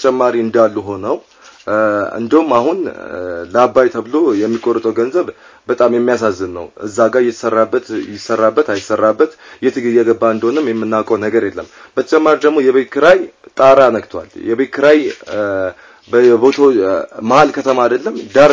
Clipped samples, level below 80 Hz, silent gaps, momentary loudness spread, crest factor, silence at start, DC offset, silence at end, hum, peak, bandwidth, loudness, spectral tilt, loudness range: 0.2%; -52 dBFS; none; 13 LU; 14 dB; 0 s; under 0.1%; 0 s; none; 0 dBFS; 7.8 kHz; -13 LUFS; -5.5 dB/octave; 3 LU